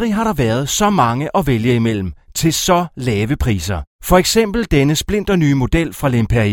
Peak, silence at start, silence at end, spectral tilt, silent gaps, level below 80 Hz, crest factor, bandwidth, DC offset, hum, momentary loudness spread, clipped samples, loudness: 0 dBFS; 0 s; 0 s; -5 dB/octave; 3.87-3.99 s; -30 dBFS; 16 dB; 18 kHz; under 0.1%; none; 5 LU; under 0.1%; -16 LUFS